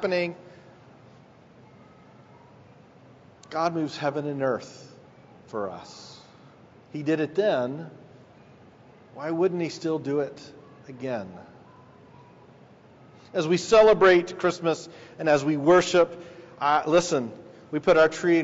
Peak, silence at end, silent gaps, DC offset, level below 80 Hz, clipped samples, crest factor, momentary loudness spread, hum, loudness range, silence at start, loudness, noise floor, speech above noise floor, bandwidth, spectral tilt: -6 dBFS; 0 s; none; under 0.1%; -62 dBFS; under 0.1%; 20 dB; 24 LU; none; 13 LU; 0 s; -24 LUFS; -53 dBFS; 29 dB; 8 kHz; -4.5 dB/octave